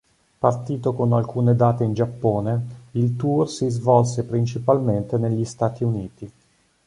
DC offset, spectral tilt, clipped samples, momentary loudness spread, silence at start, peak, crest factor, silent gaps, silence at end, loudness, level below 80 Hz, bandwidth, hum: under 0.1%; -8 dB/octave; under 0.1%; 8 LU; 0.4 s; -2 dBFS; 18 dB; none; 0.55 s; -22 LUFS; -52 dBFS; 10.5 kHz; none